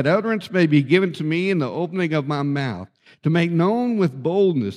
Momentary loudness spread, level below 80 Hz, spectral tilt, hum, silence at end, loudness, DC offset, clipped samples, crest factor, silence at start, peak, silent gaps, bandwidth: 7 LU; -68 dBFS; -8 dB/octave; none; 0 s; -20 LUFS; under 0.1%; under 0.1%; 18 dB; 0 s; -2 dBFS; none; 11 kHz